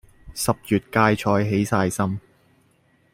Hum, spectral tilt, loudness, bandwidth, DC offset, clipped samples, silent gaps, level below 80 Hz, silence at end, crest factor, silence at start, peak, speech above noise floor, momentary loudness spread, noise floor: none; -5.5 dB/octave; -22 LUFS; 16 kHz; under 0.1%; under 0.1%; none; -52 dBFS; 0.95 s; 20 dB; 0.25 s; -2 dBFS; 40 dB; 8 LU; -61 dBFS